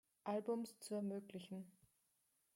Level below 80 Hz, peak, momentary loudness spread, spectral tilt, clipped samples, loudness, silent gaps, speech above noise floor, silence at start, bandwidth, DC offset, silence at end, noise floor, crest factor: under -90 dBFS; -32 dBFS; 11 LU; -6 dB/octave; under 0.1%; -47 LUFS; none; 37 dB; 0.25 s; 16.5 kHz; under 0.1%; 0.85 s; -83 dBFS; 16 dB